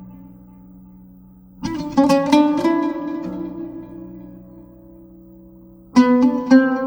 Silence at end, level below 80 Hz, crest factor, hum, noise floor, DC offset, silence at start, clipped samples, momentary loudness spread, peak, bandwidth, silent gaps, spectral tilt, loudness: 0 s; -52 dBFS; 18 dB; none; -45 dBFS; under 0.1%; 0 s; under 0.1%; 22 LU; 0 dBFS; 11.5 kHz; none; -6 dB/octave; -17 LUFS